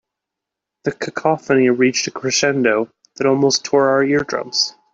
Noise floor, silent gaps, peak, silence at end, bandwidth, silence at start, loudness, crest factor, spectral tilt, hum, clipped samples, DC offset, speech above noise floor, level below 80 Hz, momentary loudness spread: -83 dBFS; none; -2 dBFS; 0.25 s; 7.8 kHz; 0.85 s; -17 LUFS; 16 dB; -3.5 dB/octave; none; under 0.1%; under 0.1%; 66 dB; -60 dBFS; 9 LU